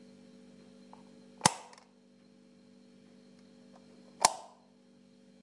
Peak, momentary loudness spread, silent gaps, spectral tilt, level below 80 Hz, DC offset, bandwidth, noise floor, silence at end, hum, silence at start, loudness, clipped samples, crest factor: -4 dBFS; 27 LU; none; -1.5 dB/octave; -78 dBFS; under 0.1%; 11.5 kHz; -62 dBFS; 1 s; none; 1.45 s; -30 LUFS; under 0.1%; 36 dB